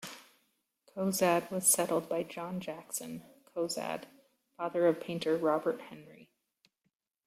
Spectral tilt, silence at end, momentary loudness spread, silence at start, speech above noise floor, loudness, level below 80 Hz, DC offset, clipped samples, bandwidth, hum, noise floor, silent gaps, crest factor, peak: -3.5 dB/octave; 1 s; 19 LU; 0 s; 50 dB; -32 LUFS; -78 dBFS; under 0.1%; under 0.1%; 16.5 kHz; none; -82 dBFS; none; 20 dB; -14 dBFS